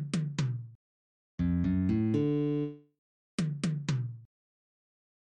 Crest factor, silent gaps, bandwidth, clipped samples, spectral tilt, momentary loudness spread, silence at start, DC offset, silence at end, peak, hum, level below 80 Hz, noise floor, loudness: 14 dB; 0.75-1.38 s, 2.98-3.38 s; 10 kHz; under 0.1%; -7.5 dB/octave; 12 LU; 0 s; under 0.1%; 1.05 s; -18 dBFS; none; -54 dBFS; under -90 dBFS; -32 LUFS